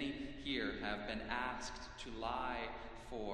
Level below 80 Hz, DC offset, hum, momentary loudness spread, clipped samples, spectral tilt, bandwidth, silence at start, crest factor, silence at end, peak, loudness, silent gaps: -56 dBFS; under 0.1%; none; 9 LU; under 0.1%; -4 dB/octave; 12 kHz; 0 s; 20 dB; 0 s; -24 dBFS; -43 LUFS; none